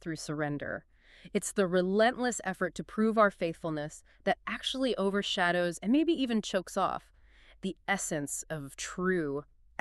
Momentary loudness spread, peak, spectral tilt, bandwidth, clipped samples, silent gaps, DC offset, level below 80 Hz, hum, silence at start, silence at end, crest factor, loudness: 12 LU; -12 dBFS; -4.5 dB/octave; 13.5 kHz; under 0.1%; none; under 0.1%; -60 dBFS; none; 0.05 s; 0.4 s; 18 dB; -31 LUFS